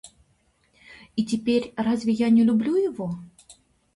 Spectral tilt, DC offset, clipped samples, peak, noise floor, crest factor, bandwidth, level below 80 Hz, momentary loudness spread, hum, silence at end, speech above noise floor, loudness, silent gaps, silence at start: -6.5 dB/octave; under 0.1%; under 0.1%; -12 dBFS; -66 dBFS; 14 dB; 11.5 kHz; -60 dBFS; 14 LU; none; 0.45 s; 43 dB; -23 LUFS; none; 0.05 s